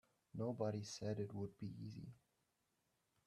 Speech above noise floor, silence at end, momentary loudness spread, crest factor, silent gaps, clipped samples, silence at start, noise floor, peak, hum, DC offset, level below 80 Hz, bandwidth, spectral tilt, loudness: 39 dB; 1.1 s; 13 LU; 20 dB; none; under 0.1%; 0.35 s; -85 dBFS; -28 dBFS; none; under 0.1%; -78 dBFS; 12.5 kHz; -6.5 dB/octave; -47 LUFS